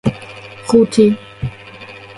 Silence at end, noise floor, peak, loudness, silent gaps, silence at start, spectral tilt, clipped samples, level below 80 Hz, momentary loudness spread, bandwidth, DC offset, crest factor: 0.05 s; -35 dBFS; 0 dBFS; -14 LUFS; none; 0.05 s; -6.5 dB/octave; under 0.1%; -42 dBFS; 22 LU; 11.5 kHz; under 0.1%; 16 dB